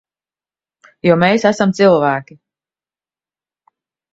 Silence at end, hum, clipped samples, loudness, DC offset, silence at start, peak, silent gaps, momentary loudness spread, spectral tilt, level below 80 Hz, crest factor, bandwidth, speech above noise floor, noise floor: 1.9 s; none; under 0.1%; -14 LUFS; under 0.1%; 1.05 s; 0 dBFS; none; 7 LU; -6 dB/octave; -58 dBFS; 18 dB; 8 kHz; over 77 dB; under -90 dBFS